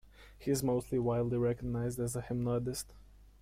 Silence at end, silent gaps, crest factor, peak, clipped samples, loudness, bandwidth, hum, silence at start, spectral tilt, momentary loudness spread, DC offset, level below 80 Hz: 0.15 s; none; 14 dB; -20 dBFS; under 0.1%; -35 LUFS; 16.5 kHz; none; 0.05 s; -6.5 dB/octave; 8 LU; under 0.1%; -54 dBFS